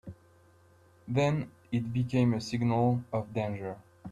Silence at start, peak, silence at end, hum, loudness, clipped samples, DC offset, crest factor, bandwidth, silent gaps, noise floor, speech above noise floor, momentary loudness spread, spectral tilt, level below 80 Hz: 0.05 s; -16 dBFS; 0 s; none; -31 LUFS; under 0.1%; under 0.1%; 16 dB; 10 kHz; none; -61 dBFS; 32 dB; 12 LU; -7.5 dB/octave; -62 dBFS